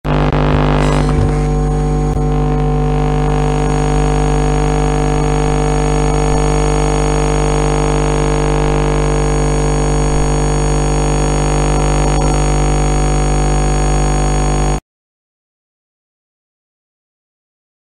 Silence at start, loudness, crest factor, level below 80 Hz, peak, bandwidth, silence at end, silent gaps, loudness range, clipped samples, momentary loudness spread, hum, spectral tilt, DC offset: 0.05 s; -15 LUFS; 14 dB; -18 dBFS; 0 dBFS; 10.5 kHz; 3.15 s; none; 3 LU; under 0.1%; 2 LU; 50 Hz at -15 dBFS; -6 dB/octave; under 0.1%